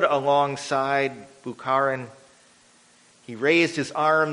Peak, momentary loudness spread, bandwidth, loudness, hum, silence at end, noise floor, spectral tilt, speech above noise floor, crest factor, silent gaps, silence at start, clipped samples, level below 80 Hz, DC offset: -4 dBFS; 18 LU; 10.5 kHz; -23 LUFS; none; 0 s; -56 dBFS; -4.5 dB/octave; 33 dB; 20 dB; none; 0 s; under 0.1%; -70 dBFS; under 0.1%